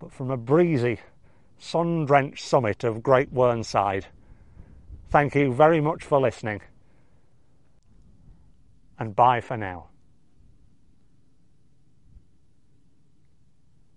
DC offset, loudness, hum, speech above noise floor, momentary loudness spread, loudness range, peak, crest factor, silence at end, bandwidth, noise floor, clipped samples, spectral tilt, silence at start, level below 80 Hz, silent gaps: 0.2%; -23 LUFS; none; 41 dB; 13 LU; 6 LU; -2 dBFS; 24 dB; 1.8 s; 11 kHz; -64 dBFS; under 0.1%; -7 dB/octave; 0 s; -54 dBFS; none